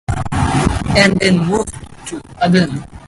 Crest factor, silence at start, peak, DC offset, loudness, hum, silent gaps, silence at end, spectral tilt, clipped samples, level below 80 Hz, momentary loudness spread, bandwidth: 16 dB; 0.1 s; 0 dBFS; under 0.1%; -14 LUFS; none; none; 0 s; -5.5 dB/octave; under 0.1%; -28 dBFS; 17 LU; 11.5 kHz